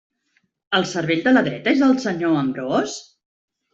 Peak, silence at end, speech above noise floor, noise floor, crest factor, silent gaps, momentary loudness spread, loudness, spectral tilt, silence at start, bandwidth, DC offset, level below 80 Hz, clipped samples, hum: -4 dBFS; 0.7 s; 49 dB; -68 dBFS; 16 dB; none; 6 LU; -20 LUFS; -5 dB/octave; 0.7 s; 7.8 kHz; under 0.1%; -62 dBFS; under 0.1%; none